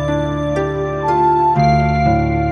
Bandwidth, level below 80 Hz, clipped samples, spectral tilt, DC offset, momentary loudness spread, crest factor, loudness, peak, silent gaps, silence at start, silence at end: 6.6 kHz; -28 dBFS; under 0.1%; -8 dB/octave; under 0.1%; 6 LU; 12 dB; -15 LUFS; -2 dBFS; none; 0 s; 0 s